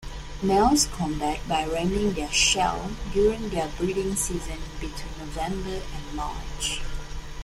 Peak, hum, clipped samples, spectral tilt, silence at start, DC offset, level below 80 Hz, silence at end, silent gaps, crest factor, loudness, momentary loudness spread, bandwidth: -8 dBFS; none; under 0.1%; -3.5 dB/octave; 0 s; under 0.1%; -36 dBFS; 0 s; none; 18 dB; -26 LUFS; 15 LU; 16 kHz